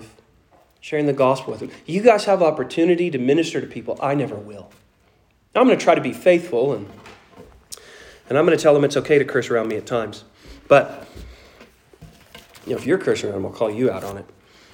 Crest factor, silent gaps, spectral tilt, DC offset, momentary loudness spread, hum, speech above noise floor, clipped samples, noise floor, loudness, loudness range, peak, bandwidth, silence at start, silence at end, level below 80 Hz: 20 dB; none; -6 dB/octave; under 0.1%; 22 LU; none; 40 dB; under 0.1%; -59 dBFS; -19 LUFS; 5 LU; 0 dBFS; 17 kHz; 0 s; 0.5 s; -54 dBFS